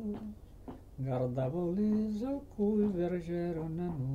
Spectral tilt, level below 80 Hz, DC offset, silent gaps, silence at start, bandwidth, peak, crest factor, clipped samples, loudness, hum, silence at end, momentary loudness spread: -10 dB/octave; -54 dBFS; under 0.1%; none; 0 s; 7.2 kHz; -22 dBFS; 12 dB; under 0.1%; -34 LUFS; none; 0 s; 17 LU